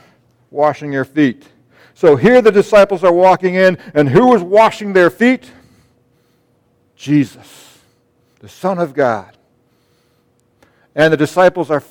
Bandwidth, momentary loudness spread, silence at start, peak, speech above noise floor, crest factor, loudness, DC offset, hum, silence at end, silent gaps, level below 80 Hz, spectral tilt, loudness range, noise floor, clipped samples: 16.5 kHz; 11 LU; 0.55 s; 0 dBFS; 46 dB; 14 dB; -12 LUFS; under 0.1%; none; 0.1 s; none; -50 dBFS; -6.5 dB/octave; 12 LU; -58 dBFS; under 0.1%